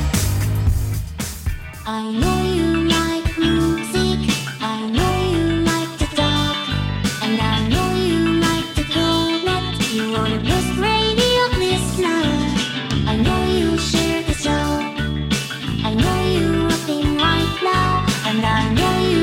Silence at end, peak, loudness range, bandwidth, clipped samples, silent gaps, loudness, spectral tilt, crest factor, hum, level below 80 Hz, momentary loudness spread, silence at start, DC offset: 0 s; -2 dBFS; 2 LU; 17.5 kHz; under 0.1%; none; -19 LUFS; -5 dB/octave; 16 dB; none; -30 dBFS; 5 LU; 0 s; under 0.1%